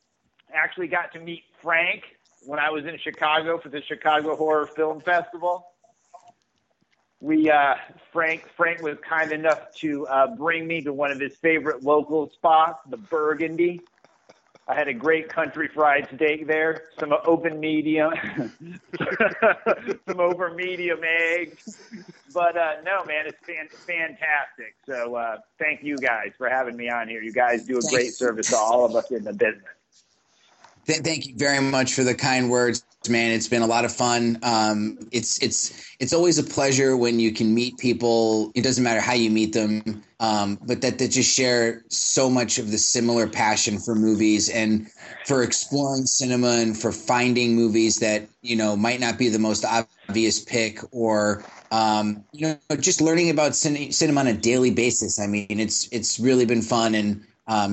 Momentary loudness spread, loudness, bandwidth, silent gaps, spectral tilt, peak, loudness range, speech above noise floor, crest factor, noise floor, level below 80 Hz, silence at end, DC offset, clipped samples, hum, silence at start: 9 LU; -22 LUFS; 9.4 kHz; none; -3.5 dB/octave; -6 dBFS; 5 LU; 48 dB; 16 dB; -70 dBFS; -66 dBFS; 0 s; under 0.1%; under 0.1%; none; 0.5 s